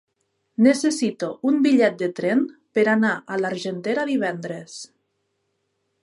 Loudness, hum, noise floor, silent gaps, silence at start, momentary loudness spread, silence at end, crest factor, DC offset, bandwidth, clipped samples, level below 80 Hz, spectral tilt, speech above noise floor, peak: -21 LUFS; none; -73 dBFS; none; 0.6 s; 15 LU; 1.15 s; 18 dB; under 0.1%; 11.5 kHz; under 0.1%; -76 dBFS; -5 dB/octave; 52 dB; -6 dBFS